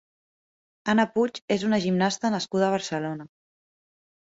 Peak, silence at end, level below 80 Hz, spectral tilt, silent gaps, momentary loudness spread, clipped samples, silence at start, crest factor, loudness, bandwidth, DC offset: -8 dBFS; 0.95 s; -66 dBFS; -5 dB/octave; 1.42-1.48 s; 9 LU; under 0.1%; 0.85 s; 18 dB; -25 LUFS; 8 kHz; under 0.1%